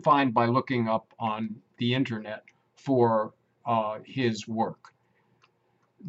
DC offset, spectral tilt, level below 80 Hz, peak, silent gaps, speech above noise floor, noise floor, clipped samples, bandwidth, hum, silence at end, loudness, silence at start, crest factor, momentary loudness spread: under 0.1%; -7 dB/octave; -74 dBFS; -8 dBFS; none; 43 dB; -70 dBFS; under 0.1%; 8 kHz; none; 0 s; -28 LUFS; 0 s; 20 dB; 14 LU